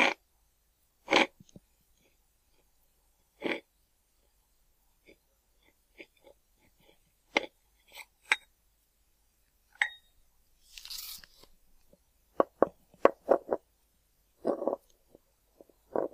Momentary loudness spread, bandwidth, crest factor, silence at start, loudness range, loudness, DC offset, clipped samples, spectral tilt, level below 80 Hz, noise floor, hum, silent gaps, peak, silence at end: 24 LU; 15.5 kHz; 32 dB; 0 s; 13 LU; -32 LUFS; under 0.1%; under 0.1%; -2.5 dB/octave; -70 dBFS; -72 dBFS; none; none; -4 dBFS; 0.05 s